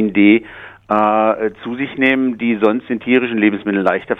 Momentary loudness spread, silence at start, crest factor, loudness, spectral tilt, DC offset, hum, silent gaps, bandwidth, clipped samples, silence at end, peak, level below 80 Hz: 10 LU; 0 s; 14 dB; -16 LUFS; -8 dB/octave; under 0.1%; none; none; 4 kHz; under 0.1%; 0.05 s; 0 dBFS; -54 dBFS